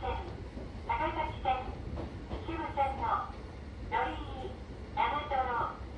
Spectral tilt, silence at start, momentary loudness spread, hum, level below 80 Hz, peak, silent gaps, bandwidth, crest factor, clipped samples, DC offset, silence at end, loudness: -6.5 dB/octave; 0 s; 11 LU; none; -44 dBFS; -18 dBFS; none; 9.8 kHz; 18 dB; under 0.1%; under 0.1%; 0 s; -36 LUFS